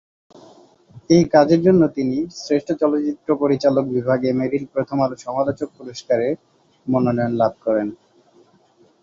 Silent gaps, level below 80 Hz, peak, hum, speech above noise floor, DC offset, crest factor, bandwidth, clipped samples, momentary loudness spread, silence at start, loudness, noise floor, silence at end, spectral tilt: none; -56 dBFS; -2 dBFS; none; 37 dB; under 0.1%; 18 dB; 7.6 kHz; under 0.1%; 11 LU; 0.95 s; -19 LUFS; -56 dBFS; 1.1 s; -7 dB/octave